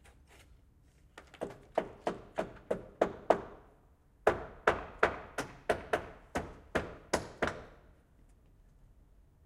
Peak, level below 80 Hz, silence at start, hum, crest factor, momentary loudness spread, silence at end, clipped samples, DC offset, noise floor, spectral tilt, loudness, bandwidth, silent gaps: -8 dBFS; -56 dBFS; 0.4 s; none; 30 dB; 15 LU; 1.7 s; under 0.1%; under 0.1%; -64 dBFS; -4.5 dB/octave; -36 LUFS; 16 kHz; none